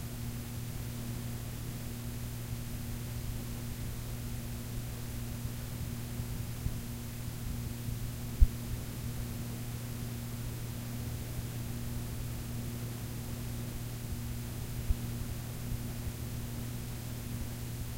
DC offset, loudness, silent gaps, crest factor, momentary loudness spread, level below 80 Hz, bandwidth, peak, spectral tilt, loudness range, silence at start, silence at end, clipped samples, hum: under 0.1%; -39 LUFS; none; 28 dB; 2 LU; -42 dBFS; 16 kHz; -8 dBFS; -5.5 dB/octave; 3 LU; 0 s; 0 s; under 0.1%; none